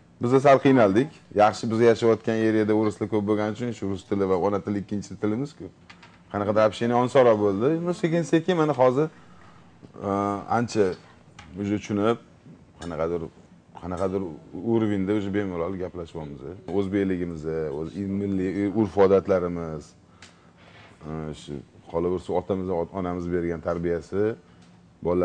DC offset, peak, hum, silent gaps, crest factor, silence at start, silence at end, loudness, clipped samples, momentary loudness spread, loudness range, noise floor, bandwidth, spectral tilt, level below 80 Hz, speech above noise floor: under 0.1%; -6 dBFS; none; none; 18 dB; 0.2 s; 0 s; -24 LUFS; under 0.1%; 16 LU; 8 LU; -53 dBFS; 9.8 kHz; -7 dB/octave; -56 dBFS; 29 dB